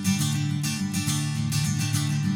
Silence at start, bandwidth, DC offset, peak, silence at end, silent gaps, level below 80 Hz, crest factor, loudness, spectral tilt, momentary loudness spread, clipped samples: 0 s; 18 kHz; under 0.1%; -12 dBFS; 0 s; none; -54 dBFS; 14 dB; -26 LUFS; -4 dB/octave; 2 LU; under 0.1%